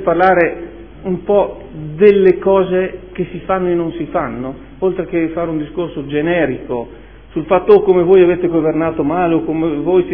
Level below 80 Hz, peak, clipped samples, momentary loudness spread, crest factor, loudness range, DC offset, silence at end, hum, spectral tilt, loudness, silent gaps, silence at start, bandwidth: -40 dBFS; 0 dBFS; 0.1%; 15 LU; 14 dB; 6 LU; 0.5%; 0 s; none; -10.5 dB/octave; -15 LUFS; none; 0 s; 4.3 kHz